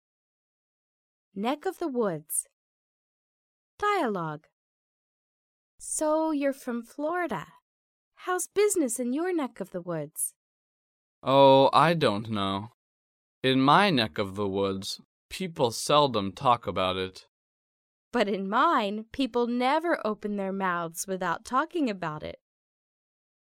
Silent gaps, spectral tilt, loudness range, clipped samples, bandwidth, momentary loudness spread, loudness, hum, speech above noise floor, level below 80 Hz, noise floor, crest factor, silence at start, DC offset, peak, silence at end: 2.53-3.78 s, 4.52-5.78 s, 7.62-8.12 s, 10.36-11.22 s, 12.74-13.42 s, 15.05-15.29 s, 17.28-18.12 s; -4 dB/octave; 8 LU; under 0.1%; 16.5 kHz; 15 LU; -27 LUFS; none; over 64 dB; -66 dBFS; under -90 dBFS; 22 dB; 1.35 s; under 0.1%; -6 dBFS; 1.15 s